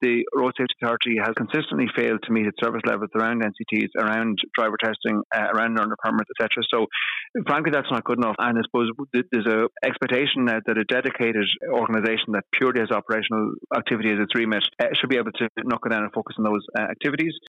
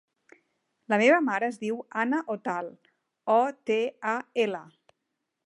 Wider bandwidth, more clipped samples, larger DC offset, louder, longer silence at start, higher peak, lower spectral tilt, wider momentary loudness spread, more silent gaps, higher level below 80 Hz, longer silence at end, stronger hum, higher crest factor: second, 7.2 kHz vs 11 kHz; neither; neither; first, -23 LUFS vs -27 LUFS; second, 0 s vs 0.9 s; about the same, -10 dBFS vs -8 dBFS; first, -6.5 dB/octave vs -5 dB/octave; second, 4 LU vs 13 LU; first, 5.25-5.30 s, 7.30-7.34 s, 15.49-15.55 s vs none; first, -70 dBFS vs -86 dBFS; second, 0.1 s vs 0.8 s; neither; second, 12 dB vs 20 dB